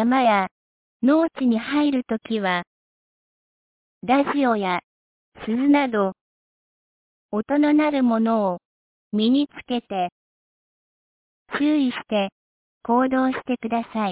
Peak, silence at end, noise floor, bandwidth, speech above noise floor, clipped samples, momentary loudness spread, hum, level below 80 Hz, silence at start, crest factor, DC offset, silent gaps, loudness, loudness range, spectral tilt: -8 dBFS; 0 s; under -90 dBFS; 4 kHz; over 69 dB; under 0.1%; 10 LU; none; -64 dBFS; 0 s; 16 dB; under 0.1%; 0.51-1.00 s, 2.67-4.01 s, 4.84-5.32 s, 6.21-7.29 s, 8.65-9.11 s, 10.12-11.46 s, 12.32-12.81 s; -22 LUFS; 4 LU; -9.5 dB/octave